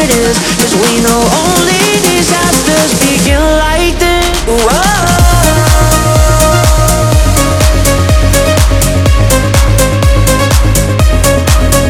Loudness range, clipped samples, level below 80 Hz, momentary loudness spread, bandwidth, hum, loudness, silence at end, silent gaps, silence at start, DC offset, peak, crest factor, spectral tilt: 1 LU; 0.6%; -12 dBFS; 2 LU; over 20 kHz; none; -8 LUFS; 0 s; none; 0 s; under 0.1%; 0 dBFS; 8 dB; -4 dB/octave